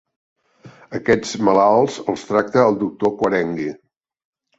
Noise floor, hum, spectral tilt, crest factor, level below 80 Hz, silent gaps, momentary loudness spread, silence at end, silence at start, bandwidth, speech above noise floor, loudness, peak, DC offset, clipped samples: -46 dBFS; none; -5.5 dB/octave; 18 dB; -56 dBFS; none; 11 LU; 0.85 s; 0.65 s; 8.2 kHz; 28 dB; -18 LUFS; -2 dBFS; under 0.1%; under 0.1%